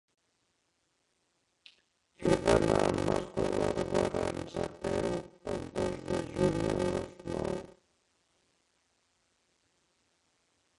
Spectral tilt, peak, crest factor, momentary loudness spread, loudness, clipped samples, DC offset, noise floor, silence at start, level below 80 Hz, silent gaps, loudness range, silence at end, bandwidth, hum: -6 dB/octave; -10 dBFS; 24 dB; 11 LU; -32 LUFS; under 0.1%; under 0.1%; -77 dBFS; 2.2 s; -52 dBFS; none; 9 LU; 3.1 s; 11.5 kHz; none